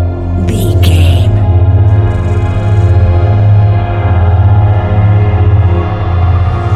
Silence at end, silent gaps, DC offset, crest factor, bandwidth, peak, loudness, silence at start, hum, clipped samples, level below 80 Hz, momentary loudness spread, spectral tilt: 0 s; none; 2%; 8 dB; 12.5 kHz; 0 dBFS; -9 LUFS; 0 s; none; 0.3%; -18 dBFS; 4 LU; -8 dB/octave